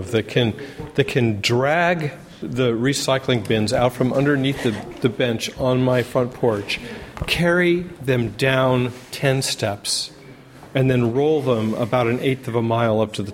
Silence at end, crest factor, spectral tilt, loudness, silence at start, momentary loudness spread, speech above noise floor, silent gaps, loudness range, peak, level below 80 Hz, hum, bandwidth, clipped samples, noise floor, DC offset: 0 s; 18 dB; -5.5 dB/octave; -20 LUFS; 0 s; 7 LU; 22 dB; none; 1 LU; -2 dBFS; -48 dBFS; none; 16.5 kHz; under 0.1%; -42 dBFS; under 0.1%